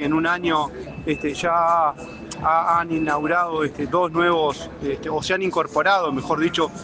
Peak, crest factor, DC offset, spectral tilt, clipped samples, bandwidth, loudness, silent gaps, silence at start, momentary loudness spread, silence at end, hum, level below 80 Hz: -6 dBFS; 16 dB; under 0.1%; -5 dB/octave; under 0.1%; 9.6 kHz; -21 LUFS; none; 0 s; 9 LU; 0 s; none; -48 dBFS